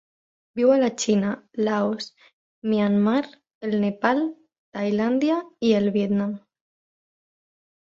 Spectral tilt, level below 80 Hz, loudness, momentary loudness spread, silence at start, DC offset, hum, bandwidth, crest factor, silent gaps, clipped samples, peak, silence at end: -6 dB/octave; -66 dBFS; -23 LUFS; 13 LU; 0.55 s; under 0.1%; none; 7.8 kHz; 20 dB; 2.33-2.62 s, 3.54-3.61 s, 4.58-4.72 s; under 0.1%; -4 dBFS; 1.55 s